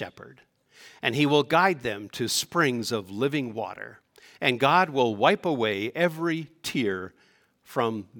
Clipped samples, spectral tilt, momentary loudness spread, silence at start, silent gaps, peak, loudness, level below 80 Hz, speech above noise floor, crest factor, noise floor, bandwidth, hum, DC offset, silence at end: under 0.1%; -4.5 dB/octave; 13 LU; 0 s; none; -4 dBFS; -25 LUFS; -70 dBFS; 37 dB; 22 dB; -63 dBFS; 18 kHz; none; under 0.1%; 0 s